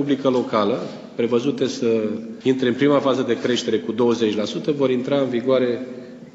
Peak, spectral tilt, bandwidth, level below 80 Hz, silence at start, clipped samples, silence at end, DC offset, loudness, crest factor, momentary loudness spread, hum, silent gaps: -4 dBFS; -6 dB/octave; 8 kHz; -68 dBFS; 0 s; under 0.1%; 0.05 s; under 0.1%; -21 LUFS; 16 dB; 7 LU; none; none